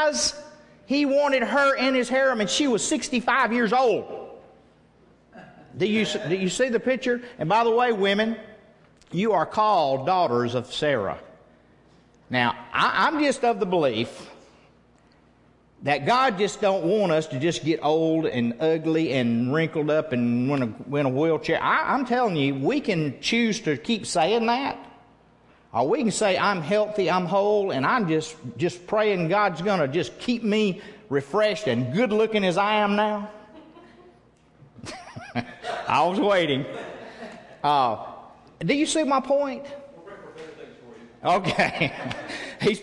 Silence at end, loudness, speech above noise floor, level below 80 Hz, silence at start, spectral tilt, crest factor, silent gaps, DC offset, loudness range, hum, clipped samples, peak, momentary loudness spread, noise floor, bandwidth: 0 s; -23 LUFS; 35 dB; -60 dBFS; 0 s; -4.5 dB/octave; 18 dB; none; under 0.1%; 4 LU; none; under 0.1%; -6 dBFS; 13 LU; -58 dBFS; 11.5 kHz